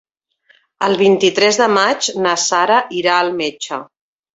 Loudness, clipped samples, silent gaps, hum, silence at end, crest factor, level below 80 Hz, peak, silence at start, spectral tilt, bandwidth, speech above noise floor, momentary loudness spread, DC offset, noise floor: -14 LUFS; under 0.1%; none; none; 0.5 s; 16 dB; -62 dBFS; 0 dBFS; 0.8 s; -2.5 dB/octave; 8 kHz; 42 dB; 9 LU; under 0.1%; -56 dBFS